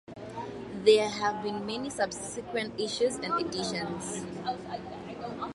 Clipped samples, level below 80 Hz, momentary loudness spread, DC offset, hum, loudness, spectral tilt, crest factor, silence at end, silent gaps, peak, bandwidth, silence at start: under 0.1%; -62 dBFS; 15 LU; under 0.1%; none; -31 LUFS; -3.5 dB/octave; 22 dB; 0 s; none; -8 dBFS; 11.5 kHz; 0.1 s